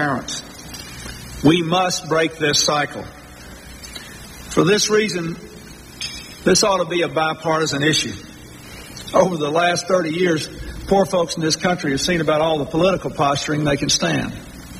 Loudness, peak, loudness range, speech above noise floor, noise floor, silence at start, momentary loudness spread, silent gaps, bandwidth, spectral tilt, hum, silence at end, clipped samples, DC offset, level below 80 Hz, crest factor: -19 LUFS; -2 dBFS; 2 LU; 20 dB; -39 dBFS; 0 s; 20 LU; none; 15.5 kHz; -3.5 dB/octave; none; 0 s; under 0.1%; under 0.1%; -44 dBFS; 18 dB